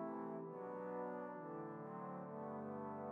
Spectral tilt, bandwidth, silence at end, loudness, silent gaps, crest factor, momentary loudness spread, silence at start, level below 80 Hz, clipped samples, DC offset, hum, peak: -9 dB/octave; 4.1 kHz; 0 s; -49 LUFS; none; 12 dB; 3 LU; 0 s; under -90 dBFS; under 0.1%; under 0.1%; none; -36 dBFS